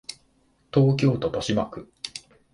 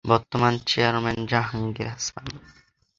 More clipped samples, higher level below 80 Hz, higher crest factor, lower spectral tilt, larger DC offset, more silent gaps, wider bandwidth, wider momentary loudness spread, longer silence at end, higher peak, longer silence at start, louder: neither; about the same, -54 dBFS vs -50 dBFS; about the same, 18 dB vs 22 dB; first, -6.5 dB/octave vs -4.5 dB/octave; neither; neither; first, 11.5 kHz vs 7.8 kHz; first, 17 LU vs 14 LU; second, 0.35 s vs 0.6 s; second, -8 dBFS vs -2 dBFS; about the same, 0.1 s vs 0.05 s; about the same, -24 LUFS vs -24 LUFS